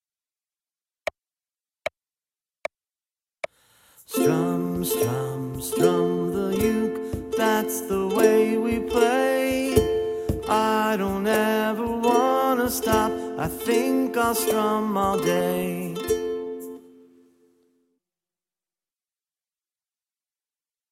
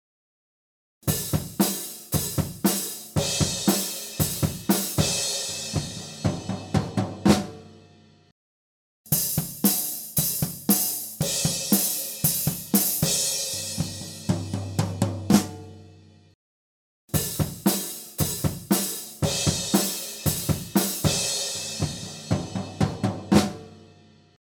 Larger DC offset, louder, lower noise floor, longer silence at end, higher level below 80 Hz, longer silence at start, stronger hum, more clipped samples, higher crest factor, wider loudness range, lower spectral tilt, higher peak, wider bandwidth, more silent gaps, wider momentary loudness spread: neither; about the same, -23 LUFS vs -25 LUFS; first, under -90 dBFS vs -54 dBFS; first, 4.15 s vs 0.7 s; about the same, -48 dBFS vs -48 dBFS; first, 3.45 s vs 1.05 s; neither; neither; about the same, 20 dB vs 22 dB; first, 13 LU vs 5 LU; about the same, -5 dB/octave vs -4 dB/octave; about the same, -4 dBFS vs -4 dBFS; second, 16.5 kHz vs over 20 kHz; second, none vs 8.32-9.04 s, 16.35-17.08 s; first, 15 LU vs 8 LU